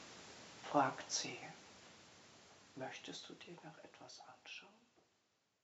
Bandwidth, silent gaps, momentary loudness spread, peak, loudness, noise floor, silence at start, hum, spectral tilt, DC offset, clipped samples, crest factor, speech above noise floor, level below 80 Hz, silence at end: 8 kHz; none; 23 LU; -20 dBFS; -44 LUFS; -82 dBFS; 0 s; none; -2.5 dB/octave; under 0.1%; under 0.1%; 28 dB; 37 dB; -86 dBFS; 0.85 s